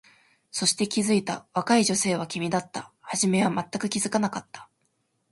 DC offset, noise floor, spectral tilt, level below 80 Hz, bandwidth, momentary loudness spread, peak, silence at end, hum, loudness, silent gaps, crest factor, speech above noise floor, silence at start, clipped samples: under 0.1%; -73 dBFS; -3.5 dB/octave; -66 dBFS; 11.5 kHz; 14 LU; -8 dBFS; 0.65 s; none; -25 LUFS; none; 18 dB; 47 dB; 0.55 s; under 0.1%